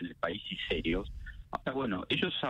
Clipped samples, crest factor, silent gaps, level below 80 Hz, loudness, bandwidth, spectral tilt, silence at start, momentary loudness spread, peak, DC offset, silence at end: under 0.1%; 18 dB; none; -48 dBFS; -34 LUFS; 10.5 kHz; -6.5 dB/octave; 0 s; 11 LU; -16 dBFS; under 0.1%; 0 s